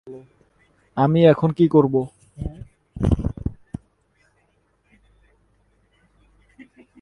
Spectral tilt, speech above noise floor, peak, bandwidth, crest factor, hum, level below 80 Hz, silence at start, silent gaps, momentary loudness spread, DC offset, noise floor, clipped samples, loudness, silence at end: -9.5 dB/octave; 47 dB; -2 dBFS; 10.5 kHz; 22 dB; none; -38 dBFS; 0.05 s; none; 26 LU; under 0.1%; -65 dBFS; under 0.1%; -19 LUFS; 3.45 s